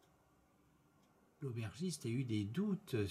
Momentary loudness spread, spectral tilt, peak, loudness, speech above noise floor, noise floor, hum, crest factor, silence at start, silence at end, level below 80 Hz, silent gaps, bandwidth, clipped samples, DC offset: 6 LU; -6.5 dB/octave; -26 dBFS; -42 LUFS; 32 dB; -72 dBFS; none; 16 dB; 1.4 s; 0 s; -78 dBFS; none; 15 kHz; under 0.1%; under 0.1%